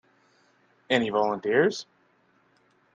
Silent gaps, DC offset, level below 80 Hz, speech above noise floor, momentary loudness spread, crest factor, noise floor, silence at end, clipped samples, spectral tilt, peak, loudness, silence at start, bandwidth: none; under 0.1%; -72 dBFS; 41 dB; 4 LU; 22 dB; -65 dBFS; 1.1 s; under 0.1%; -5 dB/octave; -6 dBFS; -25 LUFS; 0.9 s; 9 kHz